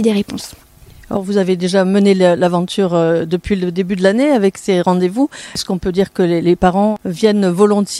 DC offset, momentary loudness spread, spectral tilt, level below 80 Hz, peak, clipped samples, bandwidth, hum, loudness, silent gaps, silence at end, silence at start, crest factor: under 0.1%; 7 LU; -6 dB/octave; -42 dBFS; 0 dBFS; under 0.1%; 14 kHz; none; -15 LUFS; none; 0 s; 0 s; 14 dB